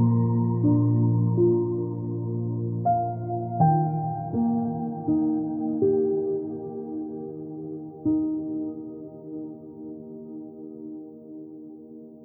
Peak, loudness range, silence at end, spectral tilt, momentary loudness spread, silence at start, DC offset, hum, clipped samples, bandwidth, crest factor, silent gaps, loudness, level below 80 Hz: -8 dBFS; 12 LU; 0 s; -16.5 dB/octave; 18 LU; 0 s; under 0.1%; none; under 0.1%; 1.7 kHz; 18 dB; none; -26 LUFS; -62 dBFS